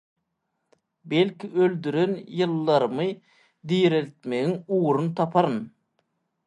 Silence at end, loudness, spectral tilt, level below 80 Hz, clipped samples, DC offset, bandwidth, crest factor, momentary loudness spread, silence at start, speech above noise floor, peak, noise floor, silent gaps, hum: 0.8 s; -24 LUFS; -7.5 dB/octave; -74 dBFS; under 0.1%; under 0.1%; 9.8 kHz; 20 dB; 8 LU; 1.05 s; 54 dB; -4 dBFS; -78 dBFS; none; none